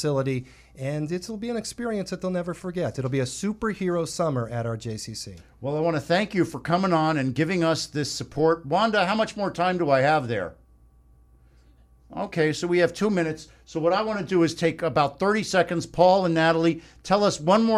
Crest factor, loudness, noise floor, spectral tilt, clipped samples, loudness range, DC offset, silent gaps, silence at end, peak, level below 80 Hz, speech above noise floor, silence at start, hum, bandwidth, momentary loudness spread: 20 dB; -24 LUFS; -55 dBFS; -5.5 dB/octave; under 0.1%; 6 LU; under 0.1%; none; 0 s; -4 dBFS; -54 dBFS; 31 dB; 0 s; none; 14 kHz; 11 LU